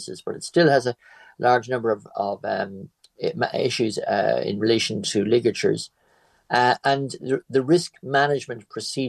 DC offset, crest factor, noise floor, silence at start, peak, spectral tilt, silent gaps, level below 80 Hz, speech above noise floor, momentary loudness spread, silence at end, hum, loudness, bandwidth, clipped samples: under 0.1%; 18 dB; -61 dBFS; 0 s; -4 dBFS; -4.5 dB/octave; none; -68 dBFS; 39 dB; 11 LU; 0 s; none; -23 LUFS; 12.5 kHz; under 0.1%